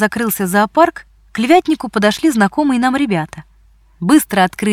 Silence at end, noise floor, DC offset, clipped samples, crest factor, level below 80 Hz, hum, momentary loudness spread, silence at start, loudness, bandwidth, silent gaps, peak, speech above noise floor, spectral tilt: 0 s; -49 dBFS; under 0.1%; under 0.1%; 14 dB; -48 dBFS; none; 8 LU; 0 s; -14 LUFS; 17 kHz; none; 0 dBFS; 35 dB; -5 dB/octave